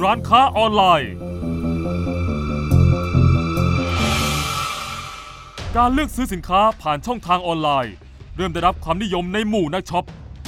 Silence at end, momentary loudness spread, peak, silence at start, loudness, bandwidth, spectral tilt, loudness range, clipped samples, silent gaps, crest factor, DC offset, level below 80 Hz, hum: 0 s; 13 LU; 0 dBFS; 0 s; -19 LUFS; 16 kHz; -5.5 dB/octave; 3 LU; under 0.1%; none; 20 dB; under 0.1%; -32 dBFS; none